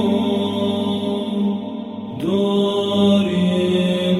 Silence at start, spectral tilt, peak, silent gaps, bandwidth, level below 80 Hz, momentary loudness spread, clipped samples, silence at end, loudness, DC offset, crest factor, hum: 0 s; -7 dB/octave; -4 dBFS; none; 12 kHz; -56 dBFS; 10 LU; under 0.1%; 0 s; -19 LUFS; under 0.1%; 14 dB; none